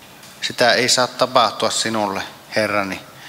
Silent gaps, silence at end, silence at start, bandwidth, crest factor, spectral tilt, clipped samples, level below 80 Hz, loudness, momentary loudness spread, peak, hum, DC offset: none; 0 s; 0 s; 16 kHz; 20 dB; -2 dB/octave; under 0.1%; -62 dBFS; -18 LUFS; 11 LU; 0 dBFS; none; under 0.1%